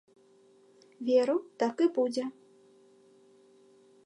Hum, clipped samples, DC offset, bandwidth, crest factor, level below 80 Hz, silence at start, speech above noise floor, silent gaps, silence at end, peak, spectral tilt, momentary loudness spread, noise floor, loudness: none; under 0.1%; under 0.1%; 10.5 kHz; 18 dB; under -90 dBFS; 1 s; 33 dB; none; 1.75 s; -14 dBFS; -5 dB/octave; 11 LU; -62 dBFS; -30 LUFS